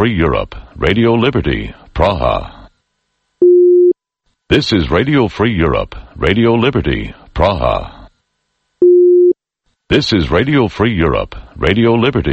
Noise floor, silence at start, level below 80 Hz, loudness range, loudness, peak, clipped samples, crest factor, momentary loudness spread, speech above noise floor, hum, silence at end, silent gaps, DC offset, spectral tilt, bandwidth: -67 dBFS; 0 s; -28 dBFS; 3 LU; -13 LUFS; 0 dBFS; under 0.1%; 14 dB; 12 LU; 54 dB; none; 0 s; none; under 0.1%; -7.5 dB/octave; 7.8 kHz